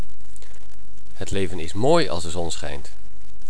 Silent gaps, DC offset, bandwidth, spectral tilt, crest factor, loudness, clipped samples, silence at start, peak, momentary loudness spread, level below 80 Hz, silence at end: none; 20%; 11 kHz; -5 dB/octave; 22 dB; -25 LUFS; under 0.1%; 0 s; -4 dBFS; 17 LU; -44 dBFS; 0 s